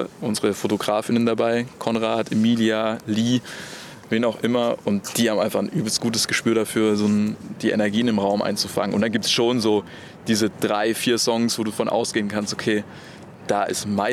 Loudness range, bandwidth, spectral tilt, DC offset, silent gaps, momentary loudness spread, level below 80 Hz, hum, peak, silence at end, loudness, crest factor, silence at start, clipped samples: 2 LU; 15.5 kHz; -4.5 dB/octave; under 0.1%; none; 6 LU; -62 dBFS; none; -6 dBFS; 0 s; -22 LUFS; 16 dB; 0 s; under 0.1%